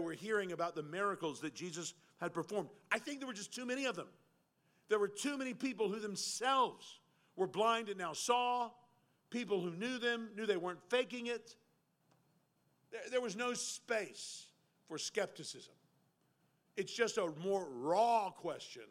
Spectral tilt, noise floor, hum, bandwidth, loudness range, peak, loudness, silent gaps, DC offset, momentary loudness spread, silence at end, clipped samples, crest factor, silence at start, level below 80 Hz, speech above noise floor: -3 dB/octave; -77 dBFS; none; 16 kHz; 6 LU; -18 dBFS; -39 LUFS; none; under 0.1%; 13 LU; 0.05 s; under 0.1%; 22 dB; 0 s; under -90 dBFS; 38 dB